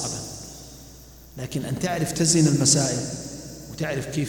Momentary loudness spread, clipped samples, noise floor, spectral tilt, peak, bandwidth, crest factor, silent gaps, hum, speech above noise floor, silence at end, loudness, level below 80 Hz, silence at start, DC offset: 22 LU; under 0.1%; -45 dBFS; -4 dB/octave; -6 dBFS; 18 kHz; 20 dB; none; none; 23 dB; 0 s; -23 LUFS; -50 dBFS; 0 s; under 0.1%